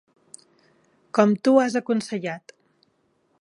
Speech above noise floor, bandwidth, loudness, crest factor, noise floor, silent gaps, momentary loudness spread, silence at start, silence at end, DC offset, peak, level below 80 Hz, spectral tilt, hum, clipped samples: 47 dB; 11 kHz; -22 LUFS; 22 dB; -67 dBFS; none; 13 LU; 1.15 s; 1.05 s; under 0.1%; -2 dBFS; -76 dBFS; -6 dB/octave; none; under 0.1%